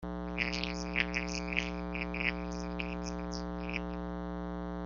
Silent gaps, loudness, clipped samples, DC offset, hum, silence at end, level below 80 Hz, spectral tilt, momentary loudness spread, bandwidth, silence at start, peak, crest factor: none; -36 LUFS; under 0.1%; under 0.1%; 60 Hz at -40 dBFS; 0 s; -46 dBFS; -3.5 dB/octave; 7 LU; 7.4 kHz; 0 s; -8 dBFS; 28 dB